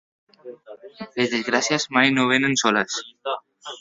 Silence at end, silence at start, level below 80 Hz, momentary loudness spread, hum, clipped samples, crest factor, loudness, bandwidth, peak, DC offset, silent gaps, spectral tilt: 0 s; 0.45 s; -66 dBFS; 16 LU; none; under 0.1%; 22 dB; -21 LUFS; 7.8 kHz; -2 dBFS; under 0.1%; none; -3 dB/octave